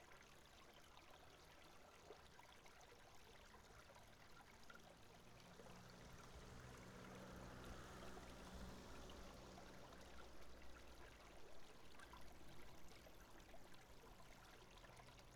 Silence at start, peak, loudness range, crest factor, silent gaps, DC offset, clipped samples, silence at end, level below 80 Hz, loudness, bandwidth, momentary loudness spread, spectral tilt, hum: 0 s; -44 dBFS; 6 LU; 16 dB; none; under 0.1%; under 0.1%; 0 s; -70 dBFS; -63 LUFS; 18 kHz; 7 LU; -4 dB/octave; none